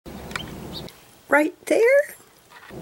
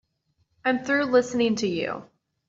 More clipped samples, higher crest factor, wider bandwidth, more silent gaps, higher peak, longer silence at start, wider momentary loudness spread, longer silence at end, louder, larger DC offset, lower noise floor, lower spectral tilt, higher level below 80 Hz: neither; about the same, 18 dB vs 18 dB; first, 17 kHz vs 7.8 kHz; neither; about the same, -6 dBFS vs -8 dBFS; second, 0.05 s vs 0.65 s; first, 19 LU vs 9 LU; second, 0 s vs 0.45 s; first, -21 LUFS vs -24 LUFS; neither; second, -48 dBFS vs -71 dBFS; about the same, -4.5 dB/octave vs -4.5 dB/octave; first, -52 dBFS vs -66 dBFS